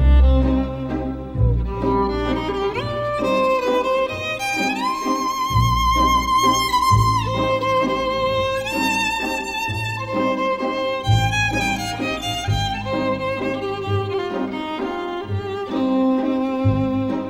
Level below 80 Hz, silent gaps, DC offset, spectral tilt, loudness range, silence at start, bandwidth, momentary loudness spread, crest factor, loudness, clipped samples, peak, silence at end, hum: -28 dBFS; none; under 0.1%; -5.5 dB/octave; 5 LU; 0 s; 16 kHz; 8 LU; 16 dB; -20 LUFS; under 0.1%; -4 dBFS; 0 s; none